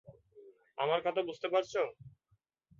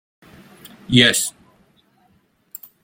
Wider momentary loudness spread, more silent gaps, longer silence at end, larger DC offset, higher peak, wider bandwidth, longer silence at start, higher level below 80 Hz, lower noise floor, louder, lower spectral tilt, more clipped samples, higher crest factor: second, 6 LU vs 25 LU; neither; second, 0.7 s vs 1.55 s; neither; second, -18 dBFS vs 0 dBFS; second, 7.4 kHz vs 16.5 kHz; second, 0.1 s vs 0.9 s; second, -76 dBFS vs -54 dBFS; first, -76 dBFS vs -60 dBFS; second, -34 LUFS vs -16 LUFS; about the same, -2.5 dB/octave vs -3 dB/octave; neither; about the same, 20 dB vs 22 dB